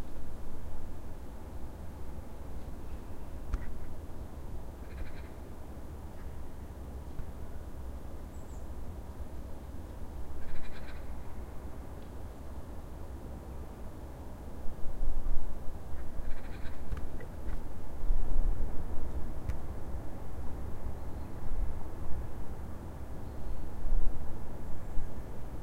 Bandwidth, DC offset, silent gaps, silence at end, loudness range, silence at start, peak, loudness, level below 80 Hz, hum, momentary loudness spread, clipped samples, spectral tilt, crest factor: 2.7 kHz; under 0.1%; none; 0 s; 5 LU; 0 s; -12 dBFS; -44 LUFS; -36 dBFS; none; 6 LU; under 0.1%; -7 dB/octave; 18 dB